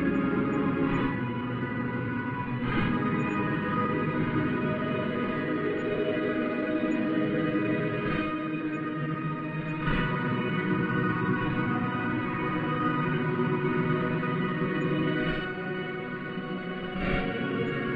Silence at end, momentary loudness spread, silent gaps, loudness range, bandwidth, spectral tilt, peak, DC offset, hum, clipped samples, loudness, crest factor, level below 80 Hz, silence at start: 0 s; 5 LU; none; 2 LU; 7.4 kHz; -9 dB/octave; -14 dBFS; under 0.1%; none; under 0.1%; -29 LUFS; 14 dB; -48 dBFS; 0 s